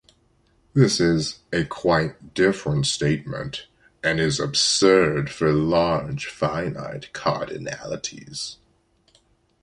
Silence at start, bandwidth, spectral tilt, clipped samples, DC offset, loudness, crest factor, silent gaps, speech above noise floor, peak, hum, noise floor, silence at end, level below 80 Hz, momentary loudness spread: 0.75 s; 11.5 kHz; -4.5 dB/octave; under 0.1%; under 0.1%; -22 LUFS; 20 dB; none; 41 dB; -4 dBFS; none; -63 dBFS; 1.1 s; -48 dBFS; 14 LU